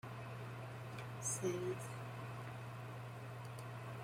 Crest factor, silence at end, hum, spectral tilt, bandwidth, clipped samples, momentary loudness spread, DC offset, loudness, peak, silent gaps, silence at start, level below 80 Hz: 18 dB; 0 s; none; -5 dB/octave; 16.5 kHz; under 0.1%; 9 LU; under 0.1%; -46 LUFS; -28 dBFS; none; 0.05 s; -74 dBFS